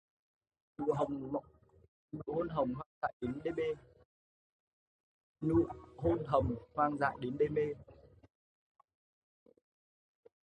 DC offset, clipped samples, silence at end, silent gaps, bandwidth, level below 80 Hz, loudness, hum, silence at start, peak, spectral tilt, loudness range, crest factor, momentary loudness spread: under 0.1%; under 0.1%; 2.4 s; 1.88-2.09 s, 2.86-3.02 s, 3.13-3.20 s, 4.05-5.35 s; 9.4 kHz; -58 dBFS; -36 LUFS; none; 0.8 s; -16 dBFS; -9 dB/octave; 5 LU; 22 dB; 9 LU